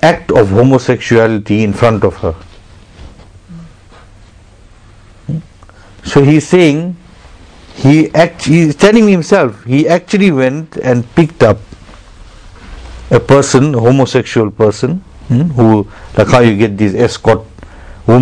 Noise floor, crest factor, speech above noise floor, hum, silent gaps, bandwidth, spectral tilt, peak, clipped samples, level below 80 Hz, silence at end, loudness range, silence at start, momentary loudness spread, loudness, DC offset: -39 dBFS; 10 dB; 30 dB; none; none; 11 kHz; -6.5 dB/octave; 0 dBFS; 2%; -36 dBFS; 0 s; 9 LU; 0 s; 12 LU; -10 LUFS; under 0.1%